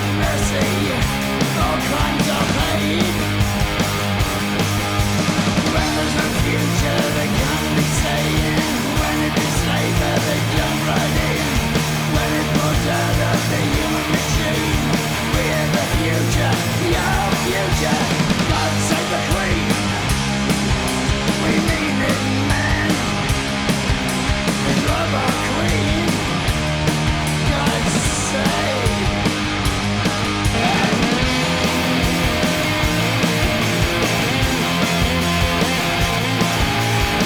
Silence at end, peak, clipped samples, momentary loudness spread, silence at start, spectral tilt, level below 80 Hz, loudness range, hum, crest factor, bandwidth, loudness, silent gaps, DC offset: 0 s; -4 dBFS; under 0.1%; 2 LU; 0 s; -4.5 dB/octave; -28 dBFS; 1 LU; none; 14 dB; over 20 kHz; -18 LUFS; none; under 0.1%